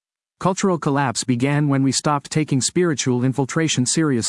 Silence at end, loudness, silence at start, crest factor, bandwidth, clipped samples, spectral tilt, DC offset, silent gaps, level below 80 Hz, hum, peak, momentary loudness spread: 0 s; -20 LUFS; 0.4 s; 16 dB; 12 kHz; under 0.1%; -4.5 dB/octave; under 0.1%; none; -60 dBFS; none; -4 dBFS; 3 LU